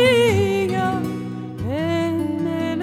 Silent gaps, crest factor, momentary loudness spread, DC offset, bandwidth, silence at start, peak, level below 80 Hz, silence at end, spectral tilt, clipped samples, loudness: none; 14 dB; 11 LU; under 0.1%; 15.5 kHz; 0 s; -6 dBFS; -50 dBFS; 0 s; -6 dB/octave; under 0.1%; -21 LUFS